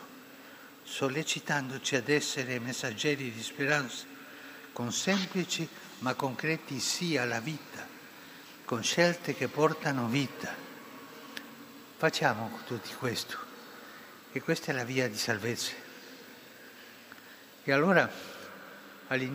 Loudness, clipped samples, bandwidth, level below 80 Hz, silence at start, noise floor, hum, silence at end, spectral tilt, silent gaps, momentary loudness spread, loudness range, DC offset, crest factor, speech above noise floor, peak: -31 LUFS; under 0.1%; 16 kHz; -80 dBFS; 0 s; -52 dBFS; none; 0 s; -4 dB/octave; none; 21 LU; 3 LU; under 0.1%; 24 dB; 21 dB; -10 dBFS